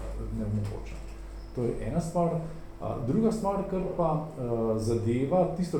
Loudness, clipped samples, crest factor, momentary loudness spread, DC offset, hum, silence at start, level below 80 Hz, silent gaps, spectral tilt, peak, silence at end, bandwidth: -30 LUFS; under 0.1%; 16 dB; 14 LU; under 0.1%; none; 0 s; -42 dBFS; none; -8 dB/octave; -14 dBFS; 0 s; 17 kHz